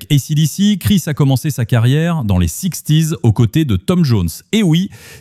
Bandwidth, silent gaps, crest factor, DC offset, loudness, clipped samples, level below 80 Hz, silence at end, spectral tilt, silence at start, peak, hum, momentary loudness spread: 16 kHz; none; 12 dB; under 0.1%; -14 LUFS; under 0.1%; -36 dBFS; 0 s; -6 dB/octave; 0 s; -2 dBFS; none; 4 LU